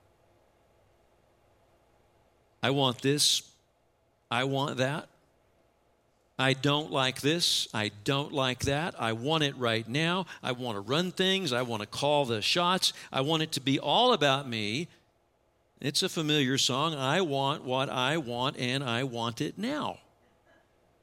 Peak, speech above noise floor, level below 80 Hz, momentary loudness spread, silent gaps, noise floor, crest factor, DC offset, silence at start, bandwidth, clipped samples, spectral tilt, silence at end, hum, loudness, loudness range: -10 dBFS; 41 dB; -64 dBFS; 8 LU; none; -70 dBFS; 22 dB; under 0.1%; 2.6 s; 16.5 kHz; under 0.1%; -4 dB/octave; 1.05 s; none; -28 LUFS; 4 LU